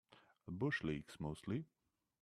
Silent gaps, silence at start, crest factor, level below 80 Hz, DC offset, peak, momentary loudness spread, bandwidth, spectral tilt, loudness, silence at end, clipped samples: none; 0.1 s; 18 dB; -68 dBFS; under 0.1%; -28 dBFS; 16 LU; 13 kHz; -7 dB/octave; -44 LUFS; 0.55 s; under 0.1%